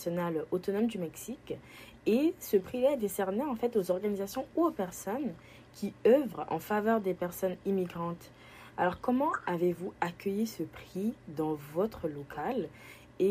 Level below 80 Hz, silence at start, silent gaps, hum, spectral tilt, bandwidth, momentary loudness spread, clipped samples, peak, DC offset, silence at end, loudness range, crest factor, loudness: -64 dBFS; 0 s; none; none; -6 dB/octave; 15.5 kHz; 14 LU; under 0.1%; -14 dBFS; under 0.1%; 0 s; 3 LU; 18 dB; -33 LUFS